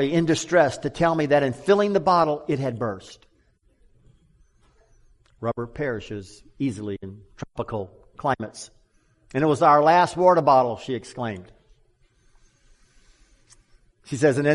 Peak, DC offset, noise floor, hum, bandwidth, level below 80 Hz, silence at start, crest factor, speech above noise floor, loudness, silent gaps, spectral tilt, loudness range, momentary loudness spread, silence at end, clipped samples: -4 dBFS; under 0.1%; -63 dBFS; none; 11.5 kHz; -56 dBFS; 0 s; 20 dB; 41 dB; -22 LUFS; none; -6 dB/octave; 14 LU; 19 LU; 0 s; under 0.1%